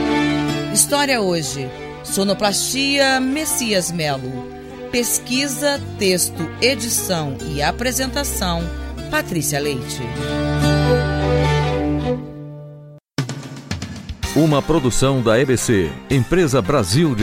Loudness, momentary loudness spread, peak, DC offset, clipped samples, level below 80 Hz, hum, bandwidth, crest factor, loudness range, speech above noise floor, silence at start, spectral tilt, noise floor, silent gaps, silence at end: -18 LUFS; 13 LU; -2 dBFS; under 0.1%; under 0.1%; -34 dBFS; none; 16.5 kHz; 18 dB; 4 LU; 22 dB; 0 s; -4 dB/octave; -40 dBFS; none; 0 s